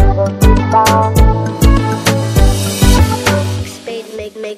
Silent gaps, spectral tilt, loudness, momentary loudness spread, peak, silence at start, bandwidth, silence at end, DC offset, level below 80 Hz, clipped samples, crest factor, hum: none; -5.5 dB/octave; -12 LUFS; 14 LU; 0 dBFS; 0 s; 16 kHz; 0 s; under 0.1%; -14 dBFS; 0.6%; 10 dB; none